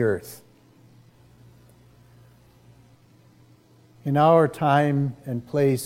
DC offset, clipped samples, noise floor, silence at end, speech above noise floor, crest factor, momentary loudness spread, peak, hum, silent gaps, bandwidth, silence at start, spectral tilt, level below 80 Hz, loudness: under 0.1%; under 0.1%; -55 dBFS; 0 s; 34 dB; 20 dB; 17 LU; -6 dBFS; none; none; 16 kHz; 0 s; -7 dB/octave; -64 dBFS; -22 LUFS